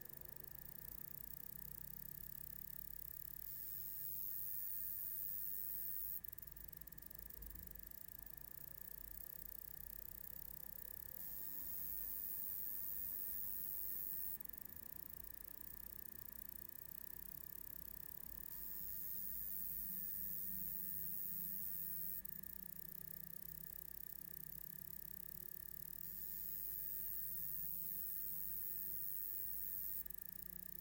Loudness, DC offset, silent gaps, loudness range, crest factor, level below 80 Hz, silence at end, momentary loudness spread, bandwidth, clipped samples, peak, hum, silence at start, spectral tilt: -45 LUFS; under 0.1%; none; 7 LU; 18 dB; -68 dBFS; 0 s; 8 LU; 17 kHz; under 0.1%; -30 dBFS; none; 0 s; -3 dB/octave